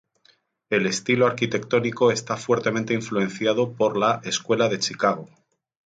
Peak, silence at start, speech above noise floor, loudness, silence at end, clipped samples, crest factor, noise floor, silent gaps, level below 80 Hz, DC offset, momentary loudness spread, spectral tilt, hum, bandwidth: -6 dBFS; 0.7 s; 39 dB; -23 LUFS; 0.65 s; under 0.1%; 18 dB; -62 dBFS; none; -66 dBFS; under 0.1%; 5 LU; -4.5 dB/octave; none; 9.4 kHz